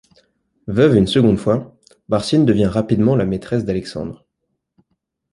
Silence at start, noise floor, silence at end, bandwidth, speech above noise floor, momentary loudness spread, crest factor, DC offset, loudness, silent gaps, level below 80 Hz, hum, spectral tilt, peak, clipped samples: 0.65 s; -74 dBFS; 1.15 s; 11.5 kHz; 58 dB; 12 LU; 16 dB; under 0.1%; -17 LUFS; none; -42 dBFS; none; -7.5 dB/octave; -2 dBFS; under 0.1%